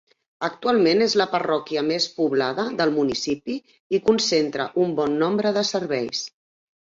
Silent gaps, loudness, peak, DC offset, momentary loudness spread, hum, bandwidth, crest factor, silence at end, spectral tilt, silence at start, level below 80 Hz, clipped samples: 3.80-3.90 s; -22 LUFS; -6 dBFS; under 0.1%; 9 LU; none; 7.8 kHz; 16 dB; 0.55 s; -4 dB/octave; 0.4 s; -64 dBFS; under 0.1%